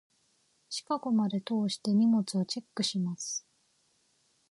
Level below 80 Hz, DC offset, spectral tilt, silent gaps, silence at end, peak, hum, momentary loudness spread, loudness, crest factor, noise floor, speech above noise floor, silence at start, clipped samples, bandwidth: -80 dBFS; under 0.1%; -5 dB/octave; none; 1.1 s; -18 dBFS; none; 10 LU; -31 LUFS; 14 dB; -71 dBFS; 42 dB; 0.7 s; under 0.1%; 11.5 kHz